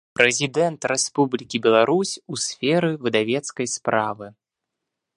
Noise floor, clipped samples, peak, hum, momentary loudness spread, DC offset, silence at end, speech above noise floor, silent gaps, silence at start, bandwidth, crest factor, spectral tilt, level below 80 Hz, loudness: -83 dBFS; under 0.1%; 0 dBFS; none; 9 LU; under 0.1%; 0.85 s; 61 dB; none; 0.2 s; 11.5 kHz; 22 dB; -3.5 dB/octave; -68 dBFS; -21 LUFS